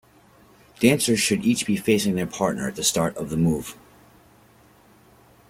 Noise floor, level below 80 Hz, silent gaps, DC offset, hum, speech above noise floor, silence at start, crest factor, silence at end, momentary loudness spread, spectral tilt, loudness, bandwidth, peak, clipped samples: -54 dBFS; -54 dBFS; none; under 0.1%; none; 32 dB; 0.8 s; 22 dB; 1.75 s; 6 LU; -4 dB/octave; -22 LUFS; 16.5 kHz; -2 dBFS; under 0.1%